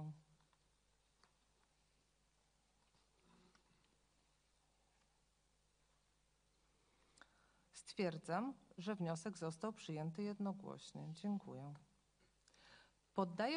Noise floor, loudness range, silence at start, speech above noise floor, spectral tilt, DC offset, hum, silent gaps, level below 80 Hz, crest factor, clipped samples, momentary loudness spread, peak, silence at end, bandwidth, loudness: -80 dBFS; 5 LU; 0 s; 35 dB; -6 dB/octave; under 0.1%; 50 Hz at -80 dBFS; none; -82 dBFS; 24 dB; under 0.1%; 18 LU; -26 dBFS; 0 s; 10 kHz; -47 LUFS